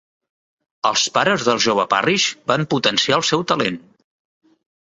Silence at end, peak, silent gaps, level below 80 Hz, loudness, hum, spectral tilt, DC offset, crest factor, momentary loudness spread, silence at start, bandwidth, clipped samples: 1.15 s; -2 dBFS; none; -60 dBFS; -17 LUFS; none; -3 dB/octave; under 0.1%; 18 dB; 5 LU; 0.85 s; 8.2 kHz; under 0.1%